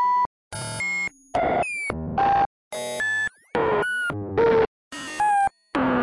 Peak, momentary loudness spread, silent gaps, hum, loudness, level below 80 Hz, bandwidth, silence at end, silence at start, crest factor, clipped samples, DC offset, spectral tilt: -8 dBFS; 9 LU; 0.26-0.51 s, 2.46-2.71 s, 4.67-4.91 s; none; -24 LUFS; -50 dBFS; 11.5 kHz; 0 s; 0 s; 16 dB; under 0.1%; under 0.1%; -4.5 dB/octave